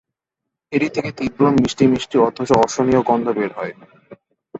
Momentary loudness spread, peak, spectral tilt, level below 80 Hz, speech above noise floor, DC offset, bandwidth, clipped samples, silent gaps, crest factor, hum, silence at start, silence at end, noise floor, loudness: 9 LU; -2 dBFS; -6 dB/octave; -50 dBFS; 65 dB; under 0.1%; 8.2 kHz; under 0.1%; none; 18 dB; none; 0.7 s; 0 s; -82 dBFS; -18 LUFS